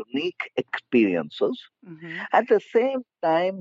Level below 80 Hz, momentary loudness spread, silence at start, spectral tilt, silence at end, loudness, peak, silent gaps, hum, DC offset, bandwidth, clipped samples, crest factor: -82 dBFS; 13 LU; 0 s; -3.5 dB/octave; 0 s; -24 LUFS; -6 dBFS; none; none; under 0.1%; 7.6 kHz; under 0.1%; 18 dB